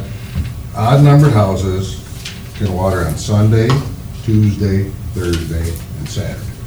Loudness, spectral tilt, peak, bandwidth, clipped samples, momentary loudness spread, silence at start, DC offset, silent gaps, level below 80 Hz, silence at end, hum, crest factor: -15 LUFS; -7 dB/octave; 0 dBFS; over 20 kHz; under 0.1%; 15 LU; 0 s; under 0.1%; none; -30 dBFS; 0 s; none; 14 dB